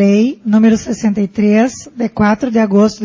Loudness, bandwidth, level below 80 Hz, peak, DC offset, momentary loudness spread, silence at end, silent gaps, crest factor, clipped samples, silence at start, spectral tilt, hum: -13 LUFS; 7.6 kHz; -44 dBFS; 0 dBFS; under 0.1%; 6 LU; 0 s; none; 12 dB; under 0.1%; 0 s; -6.5 dB/octave; none